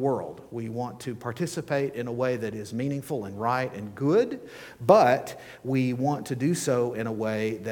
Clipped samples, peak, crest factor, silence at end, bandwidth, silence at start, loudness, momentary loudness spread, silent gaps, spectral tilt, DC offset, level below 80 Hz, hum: under 0.1%; -4 dBFS; 22 dB; 0 s; 19 kHz; 0 s; -27 LUFS; 12 LU; none; -6 dB/octave; under 0.1%; -66 dBFS; none